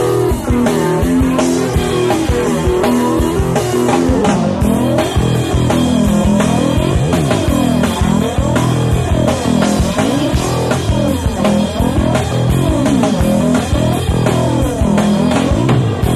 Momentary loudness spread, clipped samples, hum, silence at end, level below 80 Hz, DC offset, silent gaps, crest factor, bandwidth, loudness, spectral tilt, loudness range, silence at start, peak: 2 LU; under 0.1%; none; 0 s; -22 dBFS; under 0.1%; none; 12 dB; 14.5 kHz; -14 LUFS; -6 dB/octave; 1 LU; 0 s; 0 dBFS